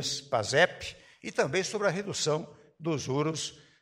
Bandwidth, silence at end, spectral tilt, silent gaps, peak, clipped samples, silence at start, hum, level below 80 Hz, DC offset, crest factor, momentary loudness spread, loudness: 16 kHz; 0.2 s; -3.5 dB/octave; none; -8 dBFS; under 0.1%; 0 s; none; -64 dBFS; under 0.1%; 22 dB; 15 LU; -30 LUFS